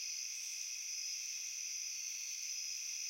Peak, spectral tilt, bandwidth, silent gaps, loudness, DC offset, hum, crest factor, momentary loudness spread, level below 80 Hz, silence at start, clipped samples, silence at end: -30 dBFS; 8 dB/octave; 16.5 kHz; none; -40 LUFS; under 0.1%; none; 14 dB; 1 LU; under -90 dBFS; 0 s; under 0.1%; 0 s